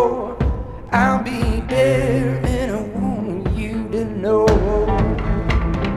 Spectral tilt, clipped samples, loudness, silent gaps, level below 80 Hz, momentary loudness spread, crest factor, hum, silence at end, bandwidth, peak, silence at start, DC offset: -7 dB/octave; under 0.1%; -19 LUFS; none; -26 dBFS; 7 LU; 16 dB; none; 0 s; 13 kHz; -2 dBFS; 0 s; under 0.1%